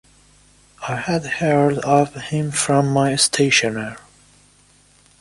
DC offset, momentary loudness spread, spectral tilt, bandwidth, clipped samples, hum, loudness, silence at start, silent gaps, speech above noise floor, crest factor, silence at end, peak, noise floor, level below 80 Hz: under 0.1%; 11 LU; -4 dB/octave; 11.5 kHz; under 0.1%; 50 Hz at -45 dBFS; -18 LUFS; 0.8 s; none; 35 dB; 18 dB; 1.2 s; -2 dBFS; -54 dBFS; -54 dBFS